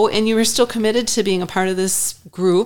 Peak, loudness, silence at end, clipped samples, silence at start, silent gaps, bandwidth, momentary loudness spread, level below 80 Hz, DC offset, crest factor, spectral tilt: -4 dBFS; -18 LUFS; 0 s; under 0.1%; 0 s; none; 19 kHz; 4 LU; -48 dBFS; 2%; 14 dB; -3.5 dB/octave